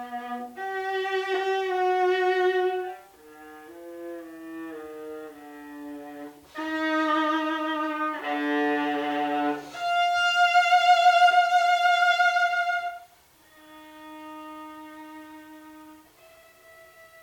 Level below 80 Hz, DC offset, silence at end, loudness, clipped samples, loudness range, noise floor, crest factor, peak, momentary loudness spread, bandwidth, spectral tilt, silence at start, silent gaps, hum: -72 dBFS; under 0.1%; 1.25 s; -24 LUFS; under 0.1%; 21 LU; -57 dBFS; 18 dB; -8 dBFS; 24 LU; 18.5 kHz; -2 dB/octave; 0 s; none; none